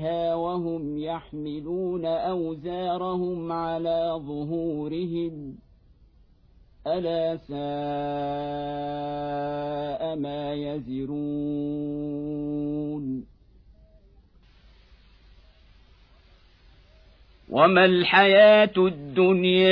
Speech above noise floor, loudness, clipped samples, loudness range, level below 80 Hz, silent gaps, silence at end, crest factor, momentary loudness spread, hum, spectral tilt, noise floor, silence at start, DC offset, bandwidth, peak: 32 dB; -25 LUFS; under 0.1%; 13 LU; -54 dBFS; none; 0 s; 20 dB; 14 LU; none; -8.5 dB/octave; -57 dBFS; 0 s; under 0.1%; 5.2 kHz; -4 dBFS